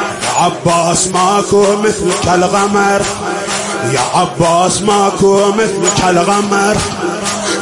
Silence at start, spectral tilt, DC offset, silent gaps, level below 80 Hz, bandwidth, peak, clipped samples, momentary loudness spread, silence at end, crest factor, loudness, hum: 0 s; -3.5 dB/octave; under 0.1%; none; -40 dBFS; 11.5 kHz; 0 dBFS; under 0.1%; 6 LU; 0 s; 12 dB; -12 LUFS; none